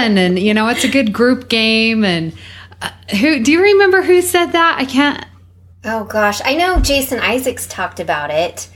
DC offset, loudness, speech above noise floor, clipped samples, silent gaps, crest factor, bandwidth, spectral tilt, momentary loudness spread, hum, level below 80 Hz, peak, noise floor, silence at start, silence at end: under 0.1%; -13 LUFS; 29 dB; under 0.1%; none; 14 dB; 18 kHz; -4 dB/octave; 12 LU; none; -30 dBFS; 0 dBFS; -43 dBFS; 0 s; 0.1 s